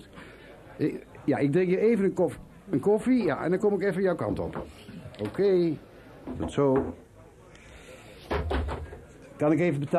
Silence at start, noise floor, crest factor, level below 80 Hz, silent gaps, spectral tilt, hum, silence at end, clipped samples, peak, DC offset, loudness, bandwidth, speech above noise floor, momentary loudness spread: 0 s; -52 dBFS; 16 dB; -44 dBFS; none; -8 dB/octave; none; 0 s; under 0.1%; -12 dBFS; under 0.1%; -27 LUFS; 13 kHz; 26 dB; 23 LU